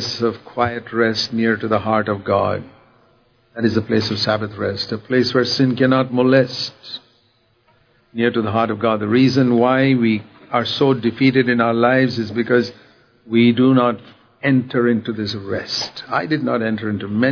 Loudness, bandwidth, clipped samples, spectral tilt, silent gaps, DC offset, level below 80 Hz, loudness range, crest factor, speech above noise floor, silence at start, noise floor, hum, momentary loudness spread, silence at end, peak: -18 LUFS; 5.4 kHz; under 0.1%; -6.5 dB/octave; none; under 0.1%; -58 dBFS; 4 LU; 16 dB; 42 dB; 0 s; -59 dBFS; none; 9 LU; 0 s; -2 dBFS